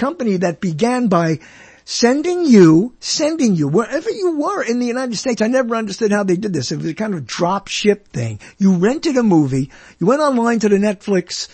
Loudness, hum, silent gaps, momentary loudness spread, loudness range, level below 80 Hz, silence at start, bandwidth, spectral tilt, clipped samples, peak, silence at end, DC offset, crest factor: -16 LUFS; none; none; 8 LU; 4 LU; -54 dBFS; 0 s; 8.8 kHz; -5.5 dB/octave; under 0.1%; 0 dBFS; 0.05 s; under 0.1%; 16 dB